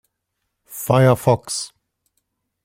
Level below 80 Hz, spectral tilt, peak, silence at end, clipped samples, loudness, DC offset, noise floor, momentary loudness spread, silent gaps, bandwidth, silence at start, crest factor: -54 dBFS; -5.5 dB/octave; -2 dBFS; 0.95 s; under 0.1%; -18 LUFS; under 0.1%; -76 dBFS; 18 LU; none; 16.5 kHz; 0.7 s; 20 dB